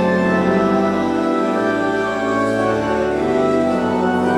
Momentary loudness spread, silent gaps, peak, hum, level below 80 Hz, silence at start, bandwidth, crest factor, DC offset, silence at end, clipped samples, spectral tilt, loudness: 3 LU; none; -4 dBFS; none; -46 dBFS; 0 s; 12.5 kHz; 12 dB; under 0.1%; 0 s; under 0.1%; -6.5 dB/octave; -17 LUFS